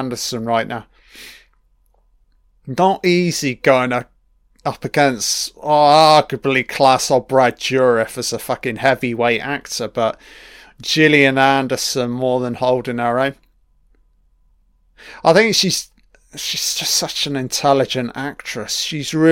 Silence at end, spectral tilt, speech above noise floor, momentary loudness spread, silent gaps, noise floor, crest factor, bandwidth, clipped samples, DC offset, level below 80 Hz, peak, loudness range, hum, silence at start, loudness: 0 s; -3.5 dB/octave; 41 dB; 13 LU; none; -57 dBFS; 18 dB; 17 kHz; under 0.1%; under 0.1%; -52 dBFS; 0 dBFS; 6 LU; none; 0 s; -16 LUFS